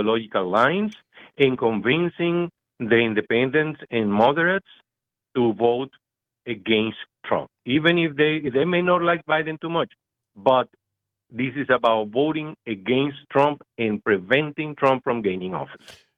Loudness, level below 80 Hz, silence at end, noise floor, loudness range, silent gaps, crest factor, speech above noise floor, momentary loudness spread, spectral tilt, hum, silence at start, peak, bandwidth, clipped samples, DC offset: -22 LUFS; -64 dBFS; 0.25 s; -86 dBFS; 2 LU; none; 18 dB; 64 dB; 11 LU; -7.5 dB/octave; none; 0 s; -4 dBFS; 7.4 kHz; under 0.1%; under 0.1%